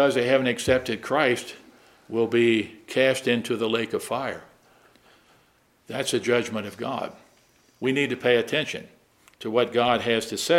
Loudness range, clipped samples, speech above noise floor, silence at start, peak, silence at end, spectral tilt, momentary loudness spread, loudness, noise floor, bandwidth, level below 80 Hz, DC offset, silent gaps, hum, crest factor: 6 LU; under 0.1%; 38 dB; 0 s; -4 dBFS; 0 s; -4 dB/octave; 11 LU; -24 LUFS; -62 dBFS; 16 kHz; -60 dBFS; under 0.1%; none; none; 20 dB